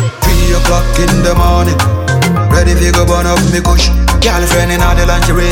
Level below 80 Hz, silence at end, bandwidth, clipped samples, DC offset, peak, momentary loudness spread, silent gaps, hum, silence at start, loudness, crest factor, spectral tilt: -12 dBFS; 0 s; 17 kHz; under 0.1%; under 0.1%; 0 dBFS; 2 LU; none; none; 0 s; -10 LUFS; 8 dB; -5 dB/octave